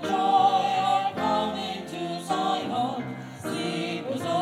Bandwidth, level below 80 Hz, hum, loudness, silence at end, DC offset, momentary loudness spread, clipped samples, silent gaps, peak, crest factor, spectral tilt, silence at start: 14 kHz; -68 dBFS; none; -26 LUFS; 0 s; under 0.1%; 12 LU; under 0.1%; none; -10 dBFS; 16 dB; -5 dB/octave; 0 s